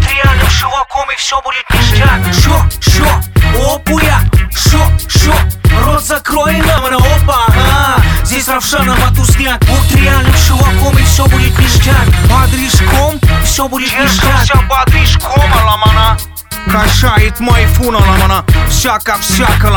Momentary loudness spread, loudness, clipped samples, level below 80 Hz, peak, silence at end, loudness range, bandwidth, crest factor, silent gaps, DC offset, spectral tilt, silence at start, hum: 4 LU; -9 LUFS; 0.2%; -12 dBFS; 0 dBFS; 0 s; 2 LU; 19.5 kHz; 8 dB; none; under 0.1%; -4.5 dB/octave; 0 s; none